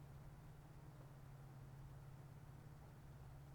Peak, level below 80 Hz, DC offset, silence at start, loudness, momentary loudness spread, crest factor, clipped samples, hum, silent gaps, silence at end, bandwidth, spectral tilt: -48 dBFS; -66 dBFS; under 0.1%; 0 s; -60 LUFS; 2 LU; 10 dB; under 0.1%; none; none; 0 s; over 20 kHz; -7 dB/octave